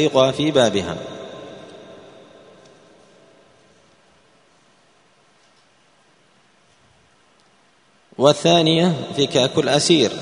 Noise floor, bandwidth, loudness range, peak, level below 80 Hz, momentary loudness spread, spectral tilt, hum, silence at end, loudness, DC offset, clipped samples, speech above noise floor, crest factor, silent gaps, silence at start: -57 dBFS; 10.5 kHz; 23 LU; 0 dBFS; -60 dBFS; 24 LU; -4.5 dB/octave; none; 0 s; -17 LUFS; under 0.1%; under 0.1%; 40 dB; 22 dB; none; 0 s